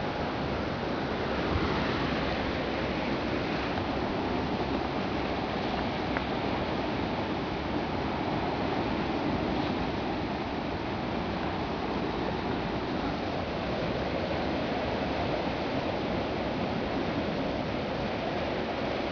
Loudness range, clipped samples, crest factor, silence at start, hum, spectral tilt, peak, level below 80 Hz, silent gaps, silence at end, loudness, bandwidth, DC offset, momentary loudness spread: 1 LU; under 0.1%; 18 dB; 0 s; none; -7 dB/octave; -12 dBFS; -44 dBFS; none; 0 s; -31 LUFS; 5.4 kHz; under 0.1%; 2 LU